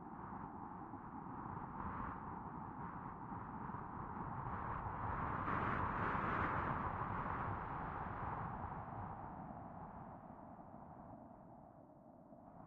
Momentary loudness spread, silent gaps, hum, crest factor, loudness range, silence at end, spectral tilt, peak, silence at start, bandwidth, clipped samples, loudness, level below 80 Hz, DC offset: 17 LU; none; none; 20 dB; 11 LU; 0 s; -6.5 dB/octave; -24 dBFS; 0 s; 6.4 kHz; under 0.1%; -45 LUFS; -60 dBFS; under 0.1%